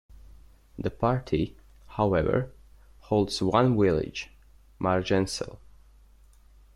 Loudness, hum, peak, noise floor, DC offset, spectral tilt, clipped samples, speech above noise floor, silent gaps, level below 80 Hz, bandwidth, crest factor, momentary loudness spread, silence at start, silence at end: -27 LUFS; none; -8 dBFS; -55 dBFS; under 0.1%; -6.5 dB/octave; under 0.1%; 30 dB; none; -48 dBFS; 13 kHz; 20 dB; 14 LU; 0.25 s; 1.2 s